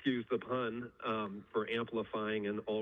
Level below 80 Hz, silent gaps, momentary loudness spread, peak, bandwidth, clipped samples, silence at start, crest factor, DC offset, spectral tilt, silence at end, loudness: -74 dBFS; none; 3 LU; -20 dBFS; 5.6 kHz; under 0.1%; 0 s; 18 dB; under 0.1%; -8 dB/octave; 0 s; -38 LUFS